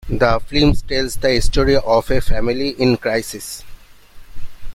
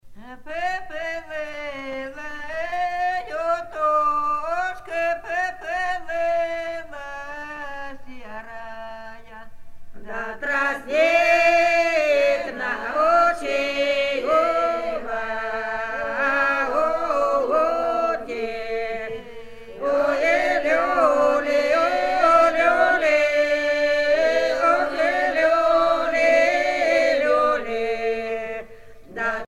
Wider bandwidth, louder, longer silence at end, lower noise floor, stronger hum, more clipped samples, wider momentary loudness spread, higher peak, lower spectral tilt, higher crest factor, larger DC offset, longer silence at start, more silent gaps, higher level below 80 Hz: first, 15 kHz vs 13 kHz; first, -18 LUFS vs -21 LUFS; about the same, 0 s vs 0 s; second, -38 dBFS vs -42 dBFS; neither; neither; second, 9 LU vs 16 LU; about the same, -2 dBFS vs -4 dBFS; first, -5 dB/octave vs -3 dB/octave; about the same, 14 dB vs 18 dB; neither; about the same, 0.05 s vs 0.05 s; neither; first, -24 dBFS vs -50 dBFS